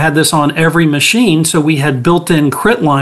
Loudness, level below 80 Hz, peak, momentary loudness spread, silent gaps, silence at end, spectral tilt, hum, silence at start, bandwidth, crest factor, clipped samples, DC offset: -10 LUFS; -42 dBFS; 0 dBFS; 3 LU; none; 0 s; -4.5 dB/octave; none; 0 s; 13 kHz; 10 dB; under 0.1%; 0.8%